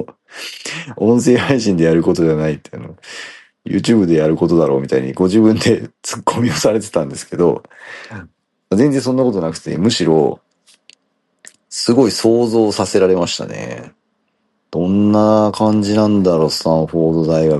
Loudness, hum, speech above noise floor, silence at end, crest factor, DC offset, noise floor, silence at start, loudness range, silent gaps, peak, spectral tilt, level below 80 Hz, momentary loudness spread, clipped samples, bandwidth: -15 LUFS; none; 52 dB; 0 s; 14 dB; under 0.1%; -66 dBFS; 0 s; 3 LU; none; 0 dBFS; -6 dB/octave; -50 dBFS; 18 LU; under 0.1%; 12.5 kHz